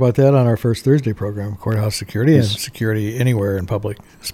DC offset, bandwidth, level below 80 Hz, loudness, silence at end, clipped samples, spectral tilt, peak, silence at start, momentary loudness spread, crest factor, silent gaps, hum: under 0.1%; 16 kHz; -46 dBFS; -18 LUFS; 0 s; under 0.1%; -6.5 dB/octave; -2 dBFS; 0 s; 11 LU; 16 dB; none; none